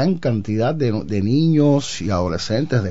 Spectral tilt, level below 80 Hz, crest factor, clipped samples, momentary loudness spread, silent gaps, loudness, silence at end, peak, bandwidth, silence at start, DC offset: -7 dB/octave; -46 dBFS; 12 dB; under 0.1%; 6 LU; none; -19 LUFS; 0 s; -6 dBFS; 8 kHz; 0 s; 2%